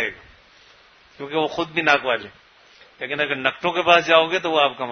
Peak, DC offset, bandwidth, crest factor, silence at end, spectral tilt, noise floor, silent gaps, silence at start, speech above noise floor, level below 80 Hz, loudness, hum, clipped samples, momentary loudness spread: 0 dBFS; under 0.1%; 6.6 kHz; 22 dB; 0 s; -4 dB/octave; -52 dBFS; none; 0 s; 32 dB; -62 dBFS; -20 LUFS; none; under 0.1%; 13 LU